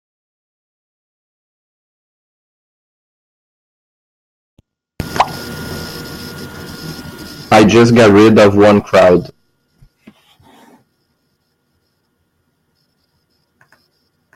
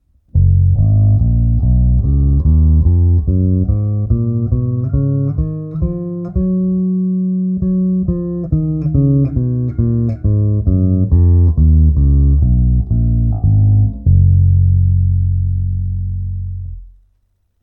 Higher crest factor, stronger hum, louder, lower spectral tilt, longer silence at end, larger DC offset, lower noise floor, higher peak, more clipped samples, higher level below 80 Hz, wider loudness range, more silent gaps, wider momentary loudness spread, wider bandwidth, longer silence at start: about the same, 16 dB vs 12 dB; neither; first, -9 LUFS vs -14 LUFS; second, -6 dB/octave vs -15.5 dB/octave; first, 5.1 s vs 0.75 s; neither; about the same, -64 dBFS vs -61 dBFS; about the same, 0 dBFS vs 0 dBFS; neither; second, -46 dBFS vs -18 dBFS; first, 15 LU vs 5 LU; neither; first, 23 LU vs 9 LU; first, 16.5 kHz vs 1.4 kHz; first, 5 s vs 0.35 s